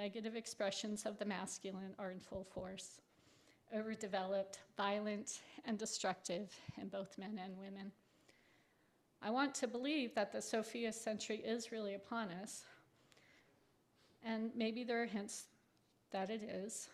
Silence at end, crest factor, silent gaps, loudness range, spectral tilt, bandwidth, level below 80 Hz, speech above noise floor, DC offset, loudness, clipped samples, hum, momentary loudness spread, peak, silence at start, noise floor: 0 s; 20 dB; none; 5 LU; -3.5 dB/octave; 14 kHz; -80 dBFS; 32 dB; under 0.1%; -44 LUFS; under 0.1%; none; 11 LU; -26 dBFS; 0 s; -76 dBFS